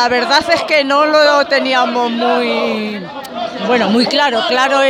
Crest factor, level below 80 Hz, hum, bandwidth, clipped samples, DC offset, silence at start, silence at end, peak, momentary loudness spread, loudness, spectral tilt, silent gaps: 12 dB; -56 dBFS; none; 16 kHz; under 0.1%; under 0.1%; 0 s; 0 s; 0 dBFS; 11 LU; -13 LUFS; -3.5 dB/octave; none